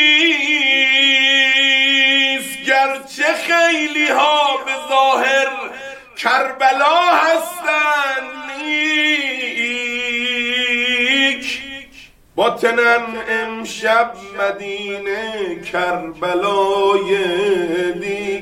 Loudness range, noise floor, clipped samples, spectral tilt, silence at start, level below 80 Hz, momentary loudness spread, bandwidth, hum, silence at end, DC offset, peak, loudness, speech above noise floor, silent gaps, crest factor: 6 LU; -43 dBFS; under 0.1%; -2 dB/octave; 0 s; -56 dBFS; 12 LU; 17 kHz; none; 0 s; under 0.1%; -2 dBFS; -15 LUFS; 26 dB; none; 16 dB